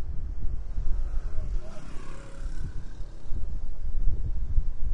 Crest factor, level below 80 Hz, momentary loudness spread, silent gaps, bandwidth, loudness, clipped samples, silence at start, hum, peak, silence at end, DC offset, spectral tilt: 14 dB; -28 dBFS; 11 LU; none; 2.4 kHz; -37 LUFS; under 0.1%; 0 s; none; -8 dBFS; 0 s; under 0.1%; -7 dB/octave